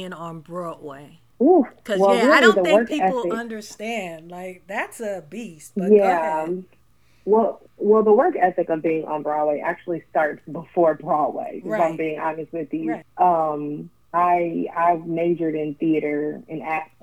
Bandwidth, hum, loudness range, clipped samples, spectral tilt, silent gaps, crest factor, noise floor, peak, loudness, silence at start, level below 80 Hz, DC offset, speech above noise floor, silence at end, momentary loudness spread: 14.5 kHz; none; 5 LU; under 0.1%; -5.5 dB/octave; none; 20 dB; -60 dBFS; -2 dBFS; -21 LUFS; 0 s; -66 dBFS; 0.1%; 39 dB; 0.2 s; 16 LU